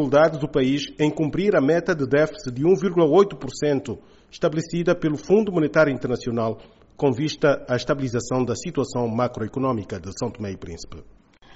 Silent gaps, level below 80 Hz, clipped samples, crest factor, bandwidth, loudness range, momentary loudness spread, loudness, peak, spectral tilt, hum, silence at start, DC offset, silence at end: none; -50 dBFS; under 0.1%; 18 dB; 8 kHz; 5 LU; 11 LU; -22 LUFS; -4 dBFS; -6 dB/octave; none; 0 s; under 0.1%; 0.55 s